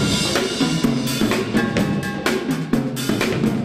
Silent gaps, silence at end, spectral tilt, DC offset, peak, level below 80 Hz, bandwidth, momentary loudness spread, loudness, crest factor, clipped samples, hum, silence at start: none; 0 s; -4.5 dB/octave; under 0.1%; -4 dBFS; -42 dBFS; 15.5 kHz; 3 LU; -20 LUFS; 16 dB; under 0.1%; none; 0 s